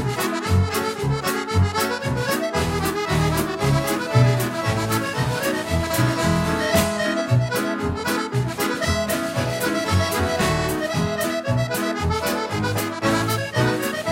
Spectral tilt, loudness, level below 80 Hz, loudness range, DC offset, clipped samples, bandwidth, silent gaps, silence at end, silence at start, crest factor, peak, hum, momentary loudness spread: -5 dB/octave; -22 LUFS; -38 dBFS; 1 LU; under 0.1%; under 0.1%; 16.5 kHz; none; 0 s; 0 s; 18 dB; -4 dBFS; none; 4 LU